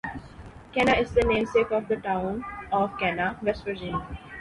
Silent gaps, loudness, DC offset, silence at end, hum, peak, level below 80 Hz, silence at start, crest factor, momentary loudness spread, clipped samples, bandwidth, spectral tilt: none; -26 LUFS; under 0.1%; 0 s; none; -8 dBFS; -44 dBFS; 0.05 s; 18 dB; 15 LU; under 0.1%; 11.5 kHz; -6 dB/octave